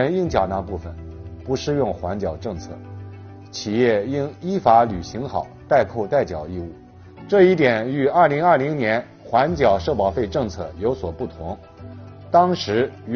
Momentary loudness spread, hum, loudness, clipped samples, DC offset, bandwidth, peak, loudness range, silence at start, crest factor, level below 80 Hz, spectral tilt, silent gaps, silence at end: 20 LU; none; -20 LUFS; under 0.1%; under 0.1%; 6.8 kHz; -2 dBFS; 6 LU; 0 s; 20 dB; -44 dBFS; -5 dB/octave; none; 0 s